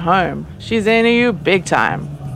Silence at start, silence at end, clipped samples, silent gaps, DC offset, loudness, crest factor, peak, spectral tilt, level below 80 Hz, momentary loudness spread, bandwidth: 0 s; 0 s; under 0.1%; none; under 0.1%; -15 LUFS; 16 dB; 0 dBFS; -5.5 dB/octave; -42 dBFS; 10 LU; 12.5 kHz